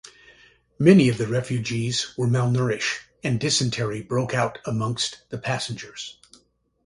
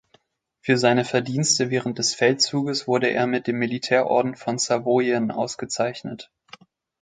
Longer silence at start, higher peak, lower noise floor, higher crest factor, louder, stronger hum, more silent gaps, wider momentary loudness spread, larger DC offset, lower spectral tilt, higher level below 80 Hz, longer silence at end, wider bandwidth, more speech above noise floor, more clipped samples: second, 0.05 s vs 0.65 s; about the same, -2 dBFS vs -4 dBFS; about the same, -62 dBFS vs -64 dBFS; about the same, 22 dB vs 20 dB; about the same, -23 LUFS vs -22 LUFS; first, 60 Hz at -45 dBFS vs none; neither; first, 13 LU vs 8 LU; neither; about the same, -5 dB/octave vs -4 dB/octave; first, -56 dBFS vs -66 dBFS; about the same, 0.75 s vs 0.75 s; first, 11.5 kHz vs 9.6 kHz; about the same, 39 dB vs 42 dB; neither